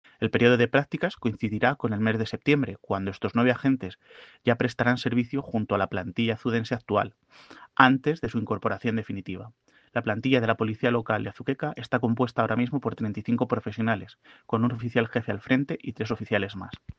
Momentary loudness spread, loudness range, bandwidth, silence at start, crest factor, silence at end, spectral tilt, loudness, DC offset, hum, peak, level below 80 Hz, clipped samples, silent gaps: 9 LU; 2 LU; 7.4 kHz; 0.2 s; 24 dB; 0.05 s; -7.5 dB/octave; -26 LUFS; under 0.1%; none; -2 dBFS; -62 dBFS; under 0.1%; none